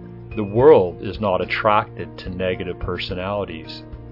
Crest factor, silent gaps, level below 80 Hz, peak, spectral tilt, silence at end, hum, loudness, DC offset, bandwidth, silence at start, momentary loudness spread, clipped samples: 18 dB; none; -42 dBFS; -2 dBFS; -8.5 dB/octave; 0 s; none; -20 LUFS; under 0.1%; 5.8 kHz; 0 s; 19 LU; under 0.1%